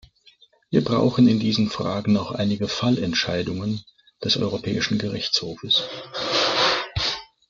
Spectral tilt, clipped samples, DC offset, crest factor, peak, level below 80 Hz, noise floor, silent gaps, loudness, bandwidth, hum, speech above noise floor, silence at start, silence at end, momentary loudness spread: -5 dB/octave; under 0.1%; under 0.1%; 18 dB; -6 dBFS; -52 dBFS; -56 dBFS; none; -22 LUFS; 7.6 kHz; none; 34 dB; 0.7 s; 0.25 s; 8 LU